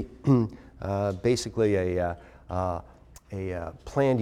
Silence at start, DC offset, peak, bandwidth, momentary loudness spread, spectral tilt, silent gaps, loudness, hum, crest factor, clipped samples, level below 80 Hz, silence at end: 0 s; under 0.1%; -10 dBFS; 13.5 kHz; 12 LU; -7 dB/octave; none; -28 LUFS; none; 18 dB; under 0.1%; -50 dBFS; 0 s